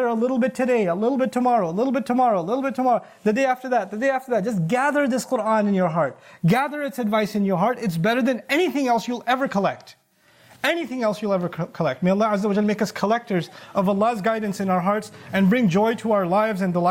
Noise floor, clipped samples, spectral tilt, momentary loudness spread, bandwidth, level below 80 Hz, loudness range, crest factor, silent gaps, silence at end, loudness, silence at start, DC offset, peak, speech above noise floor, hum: -56 dBFS; under 0.1%; -6.5 dB/octave; 5 LU; 16.5 kHz; -66 dBFS; 2 LU; 14 dB; none; 0 s; -22 LUFS; 0 s; under 0.1%; -8 dBFS; 35 dB; none